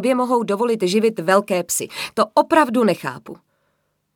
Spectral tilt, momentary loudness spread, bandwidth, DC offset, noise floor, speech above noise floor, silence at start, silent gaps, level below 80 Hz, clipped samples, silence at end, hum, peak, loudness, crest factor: -4 dB/octave; 10 LU; 19.5 kHz; under 0.1%; -69 dBFS; 51 dB; 0 s; none; -66 dBFS; under 0.1%; 0.8 s; none; -2 dBFS; -18 LUFS; 18 dB